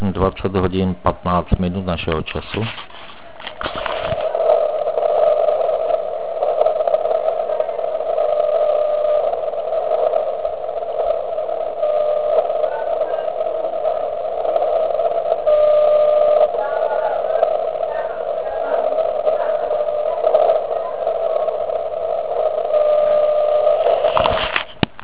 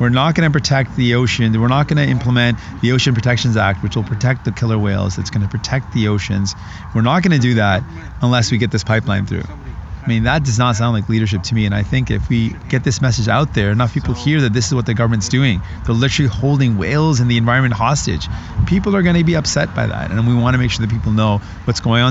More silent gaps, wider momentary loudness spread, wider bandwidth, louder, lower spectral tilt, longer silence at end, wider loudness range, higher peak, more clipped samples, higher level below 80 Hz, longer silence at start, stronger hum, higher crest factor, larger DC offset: neither; about the same, 8 LU vs 6 LU; second, 4 kHz vs 8 kHz; second, -19 LUFS vs -16 LUFS; first, -9.5 dB/octave vs -5.5 dB/octave; first, 0.15 s vs 0 s; about the same, 4 LU vs 2 LU; about the same, 0 dBFS vs 0 dBFS; neither; second, -38 dBFS vs -32 dBFS; about the same, 0 s vs 0 s; neither; about the same, 18 dB vs 16 dB; first, 1% vs under 0.1%